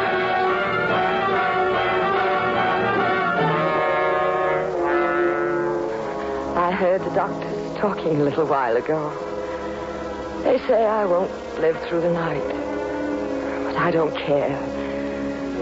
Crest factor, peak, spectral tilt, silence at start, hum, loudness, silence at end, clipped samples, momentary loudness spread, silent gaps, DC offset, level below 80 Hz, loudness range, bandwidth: 14 dB; -8 dBFS; -6.5 dB/octave; 0 s; none; -22 LUFS; 0 s; under 0.1%; 7 LU; none; under 0.1%; -48 dBFS; 3 LU; 8 kHz